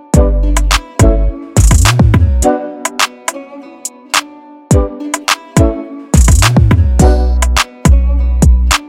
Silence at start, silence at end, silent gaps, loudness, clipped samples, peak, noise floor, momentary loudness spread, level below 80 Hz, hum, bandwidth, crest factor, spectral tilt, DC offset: 0.15 s; 0 s; none; -11 LUFS; under 0.1%; 0 dBFS; -34 dBFS; 11 LU; -12 dBFS; none; 16 kHz; 10 dB; -5 dB/octave; under 0.1%